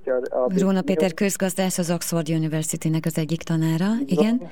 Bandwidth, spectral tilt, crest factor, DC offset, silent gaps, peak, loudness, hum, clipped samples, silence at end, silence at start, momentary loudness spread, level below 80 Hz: 18.5 kHz; -5.5 dB/octave; 16 dB; 0.9%; none; -6 dBFS; -23 LUFS; none; under 0.1%; 0 s; 0.05 s; 4 LU; -58 dBFS